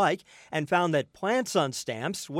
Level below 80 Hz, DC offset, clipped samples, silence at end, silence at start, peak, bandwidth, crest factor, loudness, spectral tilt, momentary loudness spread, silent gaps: -72 dBFS; under 0.1%; under 0.1%; 0 s; 0 s; -10 dBFS; 16 kHz; 18 dB; -28 LUFS; -4.5 dB/octave; 8 LU; none